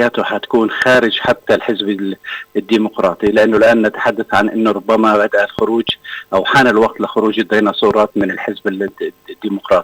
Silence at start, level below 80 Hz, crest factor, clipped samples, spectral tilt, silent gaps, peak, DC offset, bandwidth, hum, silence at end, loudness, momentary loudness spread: 0 s; -50 dBFS; 10 dB; under 0.1%; -5.5 dB/octave; none; -4 dBFS; under 0.1%; 17.5 kHz; none; 0 s; -14 LUFS; 11 LU